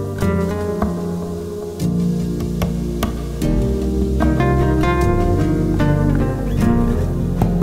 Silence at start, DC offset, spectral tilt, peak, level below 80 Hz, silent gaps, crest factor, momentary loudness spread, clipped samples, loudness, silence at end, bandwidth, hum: 0 s; under 0.1%; -8 dB/octave; -4 dBFS; -24 dBFS; none; 14 dB; 7 LU; under 0.1%; -19 LUFS; 0 s; 16 kHz; none